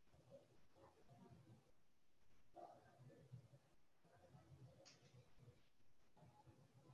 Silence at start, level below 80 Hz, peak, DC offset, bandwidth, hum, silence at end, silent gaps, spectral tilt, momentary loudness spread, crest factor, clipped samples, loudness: 0 s; -86 dBFS; -48 dBFS; under 0.1%; 9 kHz; none; 0 s; none; -6 dB/octave; 5 LU; 20 dB; under 0.1%; -67 LUFS